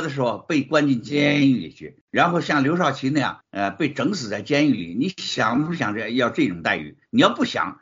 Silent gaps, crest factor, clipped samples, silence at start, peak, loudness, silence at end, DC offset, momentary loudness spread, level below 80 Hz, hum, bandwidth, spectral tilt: 2.01-2.08 s; 20 dB; under 0.1%; 0 s; -2 dBFS; -21 LUFS; 0.05 s; under 0.1%; 7 LU; -62 dBFS; none; 7.6 kHz; -4 dB/octave